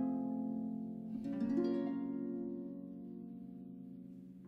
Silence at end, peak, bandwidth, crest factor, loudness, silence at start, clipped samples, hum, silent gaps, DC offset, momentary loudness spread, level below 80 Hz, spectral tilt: 0 s; -24 dBFS; 5.6 kHz; 16 dB; -41 LUFS; 0 s; under 0.1%; none; none; under 0.1%; 15 LU; -74 dBFS; -9.5 dB/octave